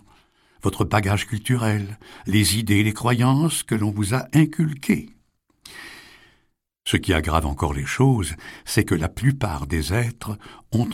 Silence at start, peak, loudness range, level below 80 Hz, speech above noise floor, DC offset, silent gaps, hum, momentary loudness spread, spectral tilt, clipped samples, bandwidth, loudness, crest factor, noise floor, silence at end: 0.65 s; -4 dBFS; 4 LU; -38 dBFS; 46 dB; under 0.1%; none; none; 15 LU; -5.5 dB/octave; under 0.1%; 16.5 kHz; -22 LUFS; 18 dB; -67 dBFS; 0 s